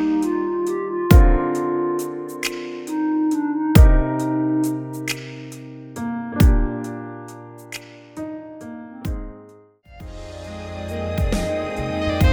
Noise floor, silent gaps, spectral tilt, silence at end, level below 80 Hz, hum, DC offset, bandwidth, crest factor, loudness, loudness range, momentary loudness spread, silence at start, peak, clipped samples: -47 dBFS; none; -6.5 dB/octave; 0 s; -24 dBFS; none; under 0.1%; over 20 kHz; 20 dB; -21 LUFS; 14 LU; 21 LU; 0 s; 0 dBFS; under 0.1%